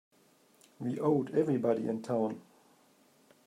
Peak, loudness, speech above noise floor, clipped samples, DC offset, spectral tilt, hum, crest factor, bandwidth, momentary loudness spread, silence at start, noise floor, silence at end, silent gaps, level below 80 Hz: -16 dBFS; -32 LUFS; 35 dB; under 0.1%; under 0.1%; -8.5 dB/octave; none; 18 dB; 14 kHz; 9 LU; 0.8 s; -66 dBFS; 1.05 s; none; -80 dBFS